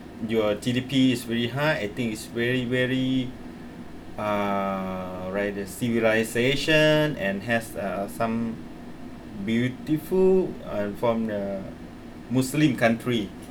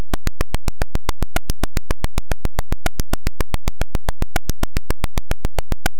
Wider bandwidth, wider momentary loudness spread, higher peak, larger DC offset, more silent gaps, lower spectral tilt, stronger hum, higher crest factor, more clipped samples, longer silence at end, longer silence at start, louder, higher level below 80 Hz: first, 19.5 kHz vs 17 kHz; first, 19 LU vs 1 LU; about the same, -8 dBFS vs -8 dBFS; neither; neither; about the same, -5.5 dB/octave vs -4.5 dB/octave; neither; first, 18 dB vs 4 dB; neither; about the same, 0 s vs 0 s; about the same, 0 s vs 0 s; about the same, -25 LUFS vs -27 LUFS; second, -50 dBFS vs -22 dBFS